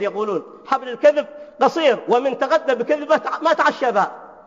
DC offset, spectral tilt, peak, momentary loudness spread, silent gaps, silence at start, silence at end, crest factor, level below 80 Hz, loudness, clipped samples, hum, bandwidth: under 0.1%; -4.5 dB/octave; -2 dBFS; 8 LU; none; 0 s; 0.1 s; 16 dB; -72 dBFS; -19 LUFS; under 0.1%; none; 7.6 kHz